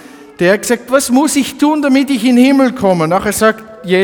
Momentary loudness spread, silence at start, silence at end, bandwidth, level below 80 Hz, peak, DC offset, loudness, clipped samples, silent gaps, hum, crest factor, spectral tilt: 5 LU; 0.2 s; 0 s; 19.5 kHz; -46 dBFS; 0 dBFS; under 0.1%; -12 LUFS; under 0.1%; none; none; 12 dB; -4.5 dB/octave